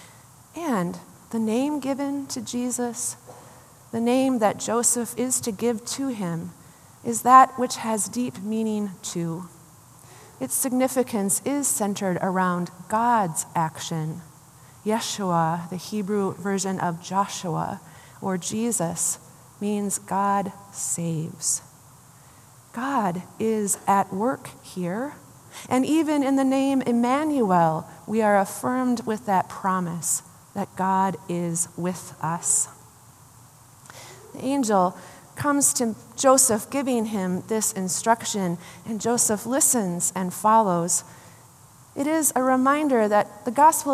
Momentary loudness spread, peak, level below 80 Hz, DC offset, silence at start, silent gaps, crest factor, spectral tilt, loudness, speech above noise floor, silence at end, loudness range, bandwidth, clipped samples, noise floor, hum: 12 LU; -2 dBFS; -68 dBFS; under 0.1%; 0 s; none; 22 dB; -4 dB/octave; -24 LUFS; 27 dB; 0 s; 5 LU; 15 kHz; under 0.1%; -50 dBFS; none